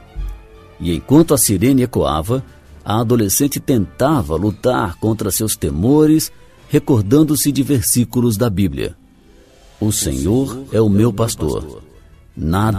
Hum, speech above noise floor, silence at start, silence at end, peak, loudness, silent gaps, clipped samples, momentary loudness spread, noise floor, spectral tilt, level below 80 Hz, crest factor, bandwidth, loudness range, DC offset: none; 31 dB; 0.15 s; 0 s; 0 dBFS; -16 LUFS; none; under 0.1%; 10 LU; -46 dBFS; -5.5 dB/octave; -34 dBFS; 16 dB; 15.5 kHz; 3 LU; under 0.1%